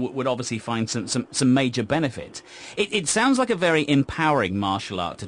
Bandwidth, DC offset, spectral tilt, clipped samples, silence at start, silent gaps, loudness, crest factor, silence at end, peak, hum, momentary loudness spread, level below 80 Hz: 10.5 kHz; under 0.1%; -4.5 dB/octave; under 0.1%; 0 s; none; -23 LUFS; 14 dB; 0 s; -8 dBFS; none; 9 LU; -54 dBFS